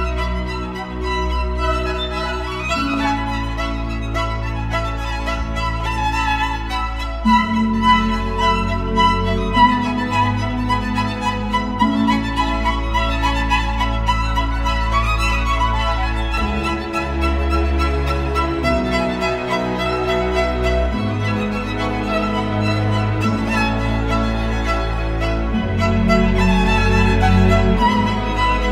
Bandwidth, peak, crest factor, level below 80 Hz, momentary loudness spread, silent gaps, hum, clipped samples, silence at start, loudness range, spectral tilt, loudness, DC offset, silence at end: 12.5 kHz; -2 dBFS; 16 dB; -24 dBFS; 7 LU; none; none; under 0.1%; 0 s; 5 LU; -6 dB/octave; -19 LUFS; under 0.1%; 0 s